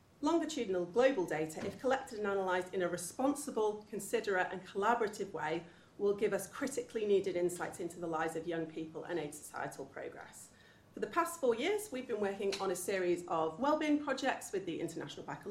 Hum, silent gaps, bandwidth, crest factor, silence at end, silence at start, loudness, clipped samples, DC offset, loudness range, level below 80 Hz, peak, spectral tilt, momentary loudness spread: none; none; 16 kHz; 20 dB; 0 s; 0.2 s; -36 LUFS; under 0.1%; under 0.1%; 5 LU; -72 dBFS; -16 dBFS; -4.5 dB/octave; 11 LU